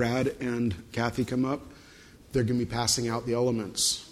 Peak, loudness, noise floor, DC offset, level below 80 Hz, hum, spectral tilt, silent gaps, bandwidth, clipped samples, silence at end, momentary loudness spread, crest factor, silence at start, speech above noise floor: -12 dBFS; -28 LUFS; -52 dBFS; under 0.1%; -52 dBFS; none; -4 dB/octave; none; 15 kHz; under 0.1%; 0 s; 5 LU; 18 dB; 0 s; 24 dB